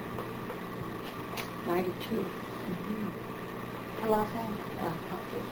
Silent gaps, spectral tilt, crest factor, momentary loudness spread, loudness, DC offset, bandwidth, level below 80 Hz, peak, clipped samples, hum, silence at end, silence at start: none; -6 dB/octave; 22 dB; 9 LU; -36 LUFS; under 0.1%; over 20 kHz; -58 dBFS; -14 dBFS; under 0.1%; none; 0 s; 0 s